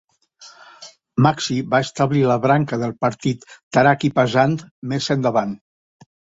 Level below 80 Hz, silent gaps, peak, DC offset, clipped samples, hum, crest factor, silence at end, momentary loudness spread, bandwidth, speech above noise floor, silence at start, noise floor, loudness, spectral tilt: -56 dBFS; 3.63-3.71 s, 4.71-4.82 s; -2 dBFS; under 0.1%; under 0.1%; none; 18 dB; 0.85 s; 11 LU; 8 kHz; 29 dB; 0.4 s; -47 dBFS; -19 LUFS; -6 dB/octave